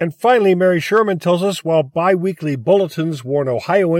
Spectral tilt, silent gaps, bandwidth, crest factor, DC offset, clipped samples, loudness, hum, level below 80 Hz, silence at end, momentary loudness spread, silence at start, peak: -6.5 dB/octave; none; 16 kHz; 14 dB; under 0.1%; under 0.1%; -16 LUFS; none; -64 dBFS; 0 s; 7 LU; 0 s; -2 dBFS